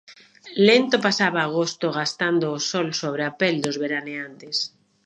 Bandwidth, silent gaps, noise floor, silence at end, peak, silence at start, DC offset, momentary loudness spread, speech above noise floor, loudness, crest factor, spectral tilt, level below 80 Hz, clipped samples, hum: 11.5 kHz; none; -43 dBFS; 0.4 s; -2 dBFS; 0.1 s; under 0.1%; 11 LU; 21 dB; -22 LUFS; 20 dB; -4 dB/octave; -74 dBFS; under 0.1%; none